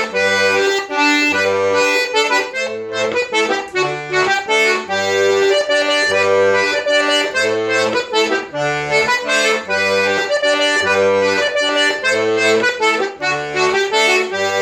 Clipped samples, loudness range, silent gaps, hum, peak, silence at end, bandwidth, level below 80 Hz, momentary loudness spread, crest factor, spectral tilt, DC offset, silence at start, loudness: under 0.1%; 2 LU; none; none; -2 dBFS; 0 s; 19 kHz; -58 dBFS; 5 LU; 14 dB; -2 dB/octave; under 0.1%; 0 s; -15 LUFS